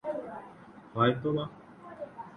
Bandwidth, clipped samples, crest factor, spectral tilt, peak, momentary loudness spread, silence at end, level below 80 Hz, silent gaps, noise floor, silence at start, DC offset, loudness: 9.8 kHz; under 0.1%; 22 dB; -8.5 dB/octave; -12 dBFS; 23 LU; 0 s; -66 dBFS; none; -51 dBFS; 0.05 s; under 0.1%; -31 LUFS